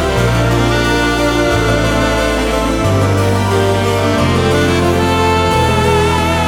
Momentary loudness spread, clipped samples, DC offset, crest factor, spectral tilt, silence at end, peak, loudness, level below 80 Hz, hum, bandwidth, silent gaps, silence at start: 2 LU; under 0.1%; under 0.1%; 12 dB; -5.5 dB/octave; 0 s; 0 dBFS; -13 LUFS; -24 dBFS; none; 17.5 kHz; none; 0 s